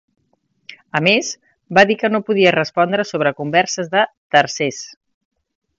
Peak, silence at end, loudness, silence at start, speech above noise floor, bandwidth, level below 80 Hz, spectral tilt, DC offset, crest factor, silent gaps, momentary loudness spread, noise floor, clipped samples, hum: 0 dBFS; 0.9 s; -16 LUFS; 0.7 s; 49 dB; 7.8 kHz; -64 dBFS; -4 dB/octave; under 0.1%; 18 dB; 4.17-4.30 s; 10 LU; -65 dBFS; under 0.1%; none